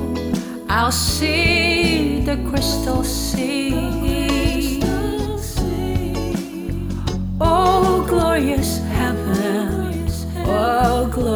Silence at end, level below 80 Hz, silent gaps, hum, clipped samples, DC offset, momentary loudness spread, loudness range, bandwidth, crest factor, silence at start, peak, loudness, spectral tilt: 0 s; -28 dBFS; none; none; under 0.1%; under 0.1%; 9 LU; 4 LU; over 20 kHz; 16 dB; 0 s; -4 dBFS; -19 LUFS; -5 dB/octave